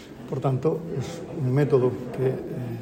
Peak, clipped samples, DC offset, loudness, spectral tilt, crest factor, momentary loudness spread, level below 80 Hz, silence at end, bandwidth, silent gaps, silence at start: -8 dBFS; under 0.1%; under 0.1%; -26 LUFS; -8.5 dB/octave; 18 dB; 11 LU; -56 dBFS; 0 s; 15.5 kHz; none; 0 s